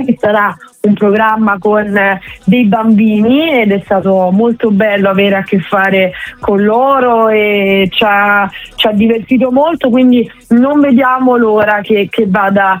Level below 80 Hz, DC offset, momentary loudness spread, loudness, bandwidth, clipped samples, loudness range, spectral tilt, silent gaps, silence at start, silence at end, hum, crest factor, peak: -46 dBFS; under 0.1%; 4 LU; -10 LUFS; 16 kHz; under 0.1%; 1 LU; -7.5 dB/octave; none; 0 s; 0 s; none; 10 dB; 0 dBFS